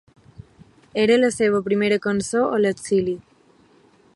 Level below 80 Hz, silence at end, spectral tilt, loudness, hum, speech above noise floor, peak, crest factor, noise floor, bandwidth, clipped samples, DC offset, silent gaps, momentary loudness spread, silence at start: -58 dBFS; 0.95 s; -5 dB/octave; -20 LUFS; none; 36 dB; -6 dBFS; 16 dB; -55 dBFS; 11.5 kHz; under 0.1%; under 0.1%; none; 8 LU; 0.95 s